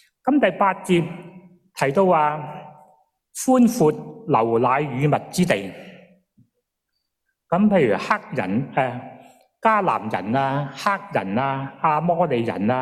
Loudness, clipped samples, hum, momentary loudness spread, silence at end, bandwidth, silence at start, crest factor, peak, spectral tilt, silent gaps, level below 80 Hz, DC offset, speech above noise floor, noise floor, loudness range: -21 LUFS; under 0.1%; none; 13 LU; 0 s; 15 kHz; 0.25 s; 18 dB; -4 dBFS; -6 dB/octave; none; -60 dBFS; under 0.1%; 57 dB; -77 dBFS; 3 LU